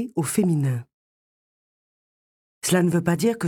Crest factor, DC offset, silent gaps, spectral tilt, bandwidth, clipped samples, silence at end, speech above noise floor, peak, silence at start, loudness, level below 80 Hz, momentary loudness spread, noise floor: 16 dB; under 0.1%; 0.94-2.62 s; -5.5 dB/octave; 18 kHz; under 0.1%; 0 s; over 68 dB; -8 dBFS; 0 s; -23 LUFS; -62 dBFS; 8 LU; under -90 dBFS